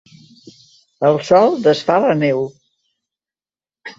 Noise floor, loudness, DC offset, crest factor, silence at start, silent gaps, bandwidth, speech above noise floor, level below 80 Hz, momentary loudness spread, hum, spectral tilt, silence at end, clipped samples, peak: under -90 dBFS; -15 LUFS; under 0.1%; 16 dB; 1 s; none; 7.8 kHz; over 76 dB; -62 dBFS; 11 LU; none; -6.5 dB/octave; 0.1 s; under 0.1%; -2 dBFS